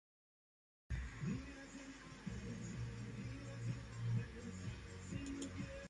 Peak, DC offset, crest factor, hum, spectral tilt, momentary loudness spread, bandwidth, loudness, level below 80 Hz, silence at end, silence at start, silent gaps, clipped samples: -30 dBFS; under 0.1%; 18 dB; none; -6 dB/octave; 9 LU; 11.5 kHz; -48 LUFS; -56 dBFS; 0 s; 0.9 s; none; under 0.1%